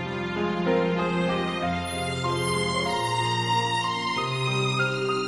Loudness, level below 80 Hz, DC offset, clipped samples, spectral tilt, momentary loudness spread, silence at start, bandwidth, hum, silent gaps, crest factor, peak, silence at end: -25 LUFS; -58 dBFS; under 0.1%; under 0.1%; -5 dB/octave; 4 LU; 0 s; 11.5 kHz; none; none; 14 dB; -12 dBFS; 0 s